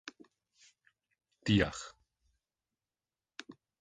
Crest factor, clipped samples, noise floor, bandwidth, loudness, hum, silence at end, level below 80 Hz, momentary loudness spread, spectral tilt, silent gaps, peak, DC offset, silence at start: 26 dB; under 0.1%; under -90 dBFS; 9.4 kHz; -33 LUFS; none; 0.3 s; -58 dBFS; 22 LU; -5.5 dB/octave; none; -14 dBFS; under 0.1%; 0.05 s